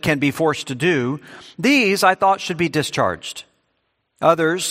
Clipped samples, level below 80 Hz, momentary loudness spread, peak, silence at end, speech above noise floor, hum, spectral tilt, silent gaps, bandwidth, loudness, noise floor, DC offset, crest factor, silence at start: under 0.1%; -56 dBFS; 14 LU; 0 dBFS; 0 s; 51 dB; none; -4.5 dB/octave; none; 16 kHz; -18 LUFS; -70 dBFS; under 0.1%; 20 dB; 0.05 s